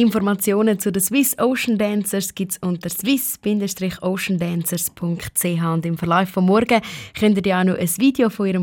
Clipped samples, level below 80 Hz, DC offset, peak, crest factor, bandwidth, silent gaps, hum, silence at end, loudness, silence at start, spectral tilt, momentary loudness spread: under 0.1%; -54 dBFS; under 0.1%; -2 dBFS; 16 dB; 17.5 kHz; none; none; 0 s; -19 LUFS; 0 s; -5 dB/octave; 6 LU